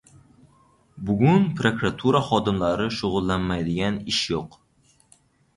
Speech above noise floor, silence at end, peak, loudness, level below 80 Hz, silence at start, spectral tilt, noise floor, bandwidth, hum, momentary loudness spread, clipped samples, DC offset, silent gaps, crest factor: 39 dB; 1.1 s; -4 dBFS; -23 LUFS; -46 dBFS; 0.95 s; -6 dB/octave; -61 dBFS; 11.5 kHz; none; 9 LU; under 0.1%; under 0.1%; none; 20 dB